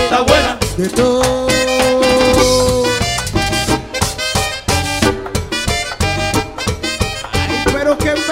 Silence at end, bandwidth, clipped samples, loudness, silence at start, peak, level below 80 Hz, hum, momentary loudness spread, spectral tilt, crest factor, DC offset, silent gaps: 0 s; 16.5 kHz; under 0.1%; -14 LUFS; 0 s; 0 dBFS; -28 dBFS; none; 7 LU; -4 dB/octave; 14 dB; under 0.1%; none